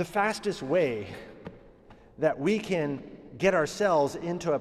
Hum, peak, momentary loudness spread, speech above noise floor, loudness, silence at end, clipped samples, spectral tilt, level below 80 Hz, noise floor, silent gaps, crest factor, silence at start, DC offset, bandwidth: none; -10 dBFS; 18 LU; 26 dB; -28 LUFS; 0 s; under 0.1%; -5.5 dB/octave; -58 dBFS; -54 dBFS; none; 18 dB; 0 s; under 0.1%; 14 kHz